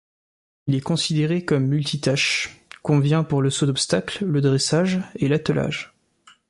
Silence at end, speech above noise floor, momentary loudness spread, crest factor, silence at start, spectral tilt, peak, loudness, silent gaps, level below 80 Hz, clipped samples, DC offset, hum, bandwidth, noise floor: 0.65 s; 34 dB; 7 LU; 16 dB; 0.65 s; -5 dB/octave; -6 dBFS; -21 LUFS; none; -56 dBFS; under 0.1%; under 0.1%; none; 11.5 kHz; -55 dBFS